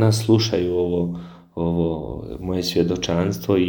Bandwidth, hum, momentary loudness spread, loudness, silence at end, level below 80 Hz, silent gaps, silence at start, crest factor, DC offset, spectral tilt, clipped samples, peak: 19.5 kHz; none; 12 LU; -22 LUFS; 0 s; -44 dBFS; none; 0 s; 16 dB; under 0.1%; -6 dB/octave; under 0.1%; -4 dBFS